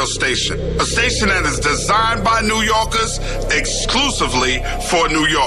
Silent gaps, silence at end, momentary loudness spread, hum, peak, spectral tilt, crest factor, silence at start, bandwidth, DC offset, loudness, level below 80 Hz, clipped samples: none; 0 s; 4 LU; none; -6 dBFS; -2.5 dB/octave; 10 dB; 0 s; 13.5 kHz; 0.5%; -16 LUFS; -26 dBFS; under 0.1%